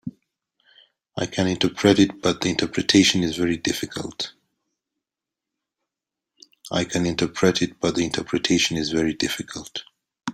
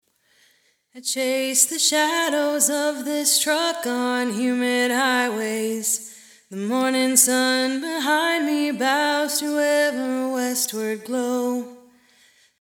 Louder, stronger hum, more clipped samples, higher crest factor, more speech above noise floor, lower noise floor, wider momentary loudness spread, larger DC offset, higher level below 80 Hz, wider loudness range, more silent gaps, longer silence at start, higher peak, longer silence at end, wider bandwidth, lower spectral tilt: about the same, -22 LUFS vs -21 LUFS; neither; neither; about the same, 22 dB vs 22 dB; first, 65 dB vs 40 dB; first, -87 dBFS vs -62 dBFS; first, 14 LU vs 9 LU; neither; first, -54 dBFS vs -80 dBFS; first, 10 LU vs 3 LU; neither; second, 0.05 s vs 0.95 s; about the same, -2 dBFS vs 0 dBFS; second, 0 s vs 0.85 s; second, 15.5 kHz vs 19 kHz; first, -4 dB/octave vs -1 dB/octave